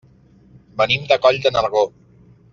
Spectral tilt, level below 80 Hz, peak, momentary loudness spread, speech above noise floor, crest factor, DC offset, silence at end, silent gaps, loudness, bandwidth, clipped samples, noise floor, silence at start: -1.5 dB/octave; -52 dBFS; -2 dBFS; 8 LU; 33 dB; 18 dB; under 0.1%; 0.65 s; none; -17 LUFS; 7.4 kHz; under 0.1%; -50 dBFS; 0.75 s